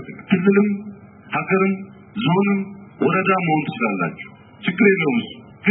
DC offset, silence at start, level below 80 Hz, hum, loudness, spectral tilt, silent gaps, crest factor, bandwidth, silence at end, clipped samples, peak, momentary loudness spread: under 0.1%; 0 s; -64 dBFS; none; -20 LUFS; -12 dB/octave; none; 18 dB; 4 kHz; 0 s; under 0.1%; -2 dBFS; 17 LU